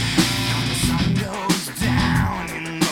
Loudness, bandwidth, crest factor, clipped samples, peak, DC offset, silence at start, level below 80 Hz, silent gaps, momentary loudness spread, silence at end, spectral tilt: -21 LUFS; 17 kHz; 18 dB; under 0.1%; -4 dBFS; under 0.1%; 0 s; -34 dBFS; none; 5 LU; 0 s; -4 dB/octave